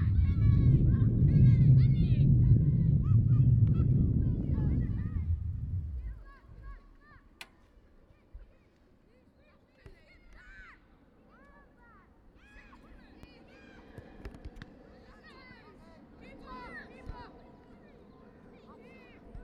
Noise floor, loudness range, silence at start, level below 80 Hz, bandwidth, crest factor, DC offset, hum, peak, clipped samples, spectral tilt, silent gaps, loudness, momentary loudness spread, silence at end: -63 dBFS; 27 LU; 0 s; -38 dBFS; 4.7 kHz; 18 dB; under 0.1%; none; -12 dBFS; under 0.1%; -10.5 dB/octave; none; -27 LUFS; 26 LU; 0 s